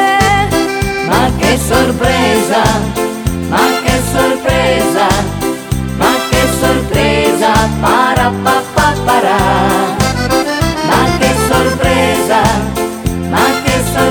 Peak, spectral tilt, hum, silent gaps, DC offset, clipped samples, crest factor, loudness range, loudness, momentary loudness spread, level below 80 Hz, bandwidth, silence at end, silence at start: 0 dBFS; -4.5 dB/octave; none; none; under 0.1%; under 0.1%; 12 dB; 1 LU; -12 LUFS; 5 LU; -24 dBFS; over 20 kHz; 0 s; 0 s